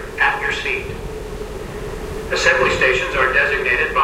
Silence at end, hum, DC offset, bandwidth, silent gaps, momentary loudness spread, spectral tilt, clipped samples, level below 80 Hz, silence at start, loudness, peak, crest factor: 0 s; none; under 0.1%; 16 kHz; none; 15 LU; -3.5 dB/octave; under 0.1%; -34 dBFS; 0 s; -16 LUFS; 0 dBFS; 18 dB